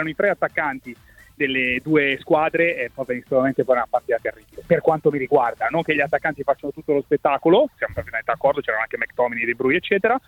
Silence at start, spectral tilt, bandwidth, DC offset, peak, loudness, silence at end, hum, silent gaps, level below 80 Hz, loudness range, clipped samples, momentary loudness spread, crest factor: 0 s; -7 dB/octave; 17 kHz; under 0.1%; -4 dBFS; -21 LUFS; 0.1 s; none; none; -54 dBFS; 1 LU; under 0.1%; 8 LU; 16 dB